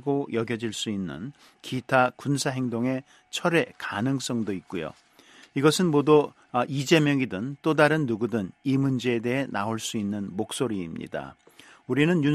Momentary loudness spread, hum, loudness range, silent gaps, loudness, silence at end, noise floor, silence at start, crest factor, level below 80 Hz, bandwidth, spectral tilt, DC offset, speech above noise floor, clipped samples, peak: 13 LU; none; 5 LU; none; -26 LUFS; 0 s; -53 dBFS; 0.05 s; 22 dB; -64 dBFS; 13.5 kHz; -5.5 dB/octave; under 0.1%; 27 dB; under 0.1%; -4 dBFS